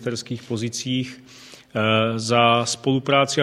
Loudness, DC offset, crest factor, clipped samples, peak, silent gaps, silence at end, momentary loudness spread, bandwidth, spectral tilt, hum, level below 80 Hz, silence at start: -21 LUFS; under 0.1%; 20 dB; under 0.1%; -2 dBFS; none; 0 s; 13 LU; 13 kHz; -4.5 dB/octave; none; -62 dBFS; 0 s